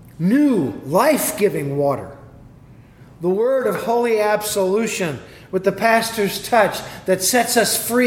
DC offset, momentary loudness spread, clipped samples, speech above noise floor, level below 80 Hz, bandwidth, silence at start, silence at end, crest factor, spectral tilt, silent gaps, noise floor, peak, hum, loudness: under 0.1%; 8 LU; under 0.1%; 26 dB; -54 dBFS; 18 kHz; 0 s; 0 s; 18 dB; -4 dB/octave; none; -44 dBFS; -2 dBFS; none; -18 LUFS